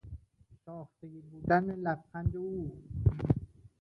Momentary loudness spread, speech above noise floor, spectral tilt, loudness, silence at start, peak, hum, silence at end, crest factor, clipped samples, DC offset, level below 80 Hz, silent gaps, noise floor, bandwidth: 21 LU; 30 dB; -10.5 dB/octave; -33 LUFS; 0.05 s; -12 dBFS; none; 0.15 s; 22 dB; under 0.1%; under 0.1%; -46 dBFS; none; -62 dBFS; 5.8 kHz